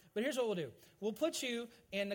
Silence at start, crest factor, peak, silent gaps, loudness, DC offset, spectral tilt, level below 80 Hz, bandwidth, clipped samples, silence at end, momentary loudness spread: 0.15 s; 16 dB; -24 dBFS; none; -39 LUFS; under 0.1%; -3.5 dB/octave; -78 dBFS; 17.5 kHz; under 0.1%; 0 s; 7 LU